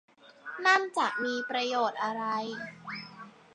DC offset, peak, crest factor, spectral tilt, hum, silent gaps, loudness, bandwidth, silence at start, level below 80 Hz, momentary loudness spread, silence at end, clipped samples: under 0.1%; -12 dBFS; 20 dB; -3 dB/octave; none; none; -29 LUFS; 11 kHz; 0.25 s; -82 dBFS; 18 LU; 0.25 s; under 0.1%